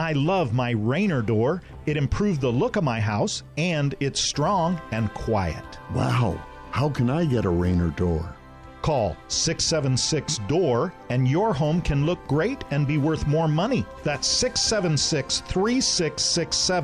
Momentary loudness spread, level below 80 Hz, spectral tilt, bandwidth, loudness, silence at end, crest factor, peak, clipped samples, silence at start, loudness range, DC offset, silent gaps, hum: 5 LU; -40 dBFS; -4.5 dB/octave; 11.5 kHz; -24 LUFS; 0 s; 12 dB; -12 dBFS; under 0.1%; 0 s; 3 LU; under 0.1%; none; none